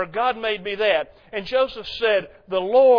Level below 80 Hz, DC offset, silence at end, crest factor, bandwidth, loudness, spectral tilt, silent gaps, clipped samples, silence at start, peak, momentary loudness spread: -54 dBFS; under 0.1%; 0 s; 14 dB; 5.4 kHz; -22 LUFS; -5.5 dB/octave; none; under 0.1%; 0 s; -6 dBFS; 7 LU